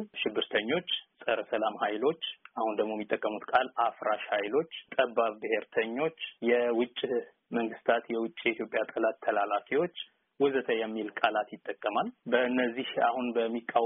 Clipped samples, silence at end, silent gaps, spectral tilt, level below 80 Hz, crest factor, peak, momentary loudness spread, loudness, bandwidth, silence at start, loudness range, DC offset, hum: under 0.1%; 0 s; none; 0.5 dB/octave; -76 dBFS; 20 dB; -10 dBFS; 6 LU; -31 LUFS; 3.9 kHz; 0 s; 1 LU; under 0.1%; none